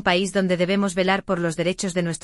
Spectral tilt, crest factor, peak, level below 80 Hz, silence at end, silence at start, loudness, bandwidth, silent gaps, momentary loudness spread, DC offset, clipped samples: -5 dB/octave; 16 dB; -6 dBFS; -52 dBFS; 0.05 s; 0 s; -22 LUFS; 11.5 kHz; none; 4 LU; under 0.1%; under 0.1%